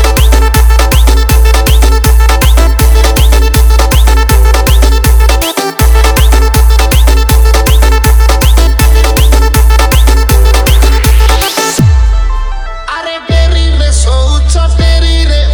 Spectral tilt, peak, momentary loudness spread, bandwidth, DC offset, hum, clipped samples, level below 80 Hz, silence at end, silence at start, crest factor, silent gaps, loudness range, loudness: -4.5 dB/octave; 0 dBFS; 3 LU; over 20 kHz; under 0.1%; none; 7%; -6 dBFS; 0 s; 0 s; 4 dB; none; 3 LU; -8 LUFS